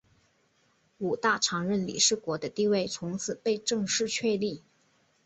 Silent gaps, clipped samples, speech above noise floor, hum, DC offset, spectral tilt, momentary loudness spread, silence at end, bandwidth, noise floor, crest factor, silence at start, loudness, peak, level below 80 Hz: none; under 0.1%; 40 dB; none; under 0.1%; -3 dB/octave; 9 LU; 0.65 s; 8.4 kHz; -69 dBFS; 20 dB; 1 s; -28 LUFS; -10 dBFS; -68 dBFS